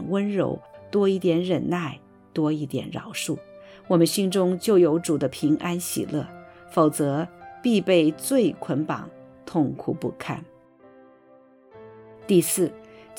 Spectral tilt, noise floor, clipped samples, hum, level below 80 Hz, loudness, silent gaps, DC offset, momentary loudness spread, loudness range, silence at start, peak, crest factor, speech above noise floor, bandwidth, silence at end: -5.5 dB/octave; -54 dBFS; under 0.1%; none; -64 dBFS; -24 LUFS; none; under 0.1%; 14 LU; 5 LU; 0 s; -6 dBFS; 18 dB; 31 dB; 19 kHz; 0 s